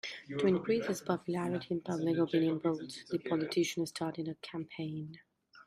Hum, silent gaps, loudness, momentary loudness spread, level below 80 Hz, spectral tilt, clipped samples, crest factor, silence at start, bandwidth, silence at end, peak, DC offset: none; none; -35 LUFS; 10 LU; -74 dBFS; -6 dB/octave; under 0.1%; 18 dB; 0.05 s; 15 kHz; 0.05 s; -16 dBFS; under 0.1%